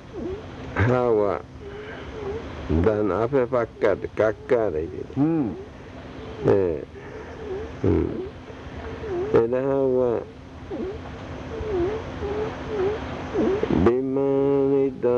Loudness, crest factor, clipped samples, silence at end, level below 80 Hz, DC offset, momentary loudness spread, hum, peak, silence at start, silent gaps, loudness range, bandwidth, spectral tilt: -24 LUFS; 16 dB; under 0.1%; 0 s; -44 dBFS; under 0.1%; 16 LU; none; -8 dBFS; 0 s; none; 4 LU; 7.4 kHz; -8.5 dB/octave